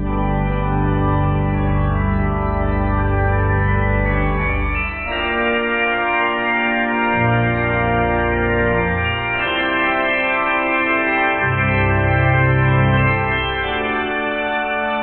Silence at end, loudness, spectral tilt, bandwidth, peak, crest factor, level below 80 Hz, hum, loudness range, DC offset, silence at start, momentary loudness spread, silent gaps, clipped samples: 0 s; -17 LUFS; -10.5 dB/octave; 4.3 kHz; -4 dBFS; 14 dB; -26 dBFS; none; 3 LU; under 0.1%; 0 s; 4 LU; none; under 0.1%